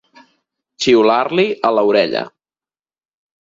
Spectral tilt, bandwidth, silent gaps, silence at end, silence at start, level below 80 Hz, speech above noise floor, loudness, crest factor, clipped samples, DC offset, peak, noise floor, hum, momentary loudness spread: -4.5 dB/octave; 7.8 kHz; none; 1.15 s; 0.8 s; -62 dBFS; over 76 dB; -15 LUFS; 18 dB; under 0.1%; under 0.1%; 0 dBFS; under -90 dBFS; none; 9 LU